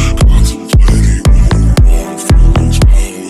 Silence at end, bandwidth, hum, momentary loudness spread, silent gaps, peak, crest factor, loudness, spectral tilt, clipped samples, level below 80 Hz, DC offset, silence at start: 0 s; 13 kHz; none; 3 LU; none; 0 dBFS; 6 dB; -10 LUFS; -6 dB/octave; under 0.1%; -8 dBFS; under 0.1%; 0 s